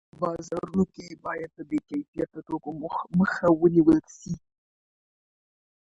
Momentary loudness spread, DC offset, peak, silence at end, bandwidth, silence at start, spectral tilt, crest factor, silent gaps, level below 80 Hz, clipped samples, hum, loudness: 16 LU; under 0.1%; -8 dBFS; 1.6 s; 7.8 kHz; 0.2 s; -8 dB/octave; 20 dB; 2.08-2.13 s; -56 dBFS; under 0.1%; none; -26 LUFS